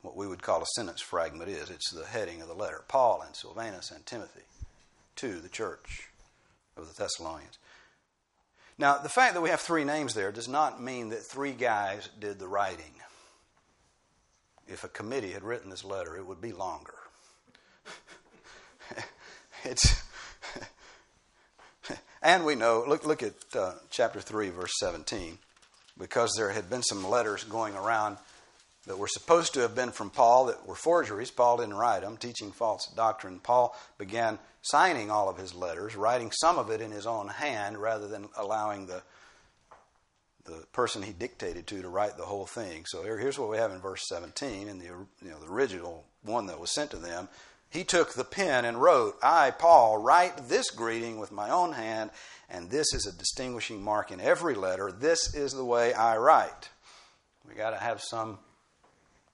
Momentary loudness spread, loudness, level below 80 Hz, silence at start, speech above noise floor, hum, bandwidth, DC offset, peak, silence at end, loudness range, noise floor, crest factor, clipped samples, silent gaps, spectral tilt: 19 LU; -29 LUFS; -50 dBFS; 0.05 s; 46 dB; none; 11.5 kHz; under 0.1%; -4 dBFS; 0.95 s; 14 LU; -75 dBFS; 26 dB; under 0.1%; none; -3 dB/octave